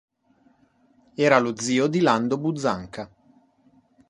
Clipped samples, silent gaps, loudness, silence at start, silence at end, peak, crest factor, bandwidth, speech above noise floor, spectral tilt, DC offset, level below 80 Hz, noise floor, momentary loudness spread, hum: under 0.1%; none; -22 LUFS; 1.2 s; 1.05 s; -2 dBFS; 24 dB; 11.5 kHz; 40 dB; -5 dB/octave; under 0.1%; -62 dBFS; -62 dBFS; 19 LU; none